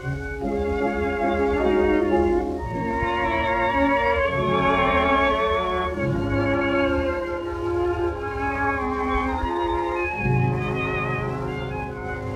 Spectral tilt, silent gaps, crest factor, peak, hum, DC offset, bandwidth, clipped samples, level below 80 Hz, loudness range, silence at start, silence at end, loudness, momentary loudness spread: -7.5 dB/octave; none; 14 dB; -8 dBFS; none; under 0.1%; 11.5 kHz; under 0.1%; -36 dBFS; 4 LU; 0 s; 0 s; -23 LUFS; 8 LU